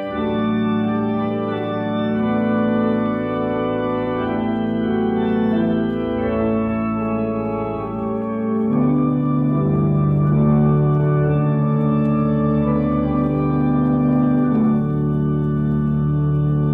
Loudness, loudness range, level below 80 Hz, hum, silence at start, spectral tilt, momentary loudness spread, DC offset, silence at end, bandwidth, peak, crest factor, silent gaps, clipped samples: -19 LUFS; 3 LU; -38 dBFS; none; 0 s; -11.5 dB/octave; 5 LU; under 0.1%; 0 s; 3.8 kHz; -6 dBFS; 12 dB; none; under 0.1%